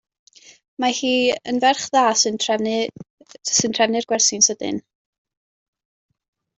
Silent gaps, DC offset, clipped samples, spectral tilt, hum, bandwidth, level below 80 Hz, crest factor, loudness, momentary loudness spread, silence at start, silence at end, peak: 3.10-3.18 s; under 0.1%; under 0.1%; -1.5 dB/octave; none; 8.2 kHz; -66 dBFS; 20 dB; -19 LUFS; 11 LU; 0.8 s; 1.75 s; -2 dBFS